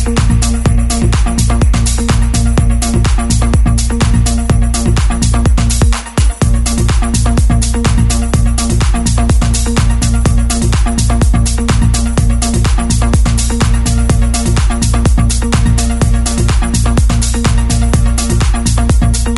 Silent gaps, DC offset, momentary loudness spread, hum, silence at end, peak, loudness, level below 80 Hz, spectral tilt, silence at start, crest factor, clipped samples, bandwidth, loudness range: none; under 0.1%; 1 LU; none; 0 s; 0 dBFS; -12 LUFS; -12 dBFS; -5 dB/octave; 0 s; 10 dB; under 0.1%; 12 kHz; 0 LU